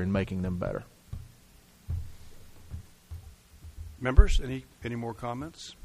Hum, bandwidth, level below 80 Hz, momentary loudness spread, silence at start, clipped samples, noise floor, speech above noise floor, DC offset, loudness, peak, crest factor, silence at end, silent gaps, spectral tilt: none; 13 kHz; -32 dBFS; 25 LU; 0 s; under 0.1%; -57 dBFS; 30 dB; under 0.1%; -31 LUFS; -4 dBFS; 26 dB; 0.1 s; none; -6.5 dB/octave